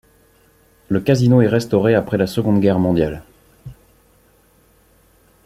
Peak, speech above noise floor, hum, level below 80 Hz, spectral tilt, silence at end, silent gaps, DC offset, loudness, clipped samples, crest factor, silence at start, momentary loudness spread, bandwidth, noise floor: -2 dBFS; 39 dB; none; -46 dBFS; -7.5 dB/octave; 1.75 s; none; under 0.1%; -16 LUFS; under 0.1%; 18 dB; 0.9 s; 8 LU; 15 kHz; -54 dBFS